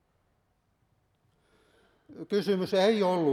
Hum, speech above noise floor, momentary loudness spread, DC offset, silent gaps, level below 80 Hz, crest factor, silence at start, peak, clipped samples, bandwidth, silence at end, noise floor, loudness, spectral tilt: none; 47 dB; 8 LU; under 0.1%; none; -76 dBFS; 18 dB; 2.1 s; -12 dBFS; under 0.1%; 14 kHz; 0 s; -73 dBFS; -27 LUFS; -6 dB/octave